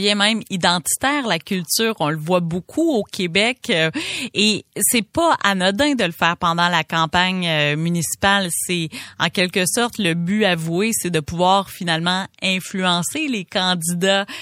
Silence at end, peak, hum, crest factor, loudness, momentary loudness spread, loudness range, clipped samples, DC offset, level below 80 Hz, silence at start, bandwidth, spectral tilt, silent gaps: 0 s; 0 dBFS; none; 20 dB; -19 LUFS; 5 LU; 2 LU; under 0.1%; under 0.1%; -52 dBFS; 0 s; 16.5 kHz; -3.5 dB/octave; none